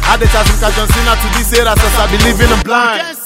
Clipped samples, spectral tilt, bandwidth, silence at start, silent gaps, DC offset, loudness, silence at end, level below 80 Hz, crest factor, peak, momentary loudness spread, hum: 0.3%; -4 dB/octave; 16.5 kHz; 0 s; none; under 0.1%; -10 LUFS; 0 s; -14 dBFS; 10 dB; 0 dBFS; 2 LU; none